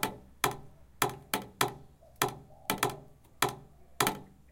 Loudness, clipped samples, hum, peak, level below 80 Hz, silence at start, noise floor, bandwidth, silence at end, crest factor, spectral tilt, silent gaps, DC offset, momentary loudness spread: -33 LUFS; under 0.1%; none; -8 dBFS; -60 dBFS; 0 s; -52 dBFS; 17 kHz; 0.2 s; 28 dB; -2.5 dB/octave; none; under 0.1%; 15 LU